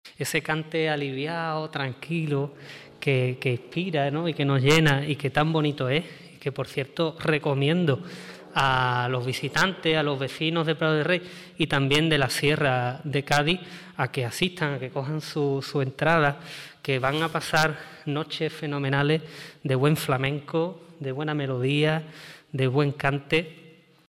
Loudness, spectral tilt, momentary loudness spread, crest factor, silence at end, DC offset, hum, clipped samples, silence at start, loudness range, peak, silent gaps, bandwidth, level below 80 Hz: -25 LUFS; -5.5 dB/octave; 10 LU; 18 dB; 0.4 s; under 0.1%; none; under 0.1%; 0.05 s; 3 LU; -8 dBFS; none; 16 kHz; -56 dBFS